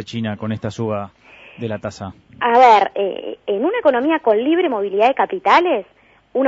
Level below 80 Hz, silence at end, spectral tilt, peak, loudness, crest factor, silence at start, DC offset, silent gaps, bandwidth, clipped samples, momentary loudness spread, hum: -58 dBFS; 0 s; -6 dB/octave; 0 dBFS; -17 LUFS; 16 dB; 0 s; under 0.1%; none; 8 kHz; under 0.1%; 16 LU; none